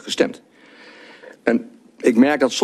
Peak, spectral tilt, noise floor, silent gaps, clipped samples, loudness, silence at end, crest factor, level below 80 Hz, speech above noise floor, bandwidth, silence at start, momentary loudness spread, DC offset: -2 dBFS; -4 dB/octave; -46 dBFS; none; under 0.1%; -19 LUFS; 0 s; 18 dB; -64 dBFS; 28 dB; 13 kHz; 0.05 s; 9 LU; under 0.1%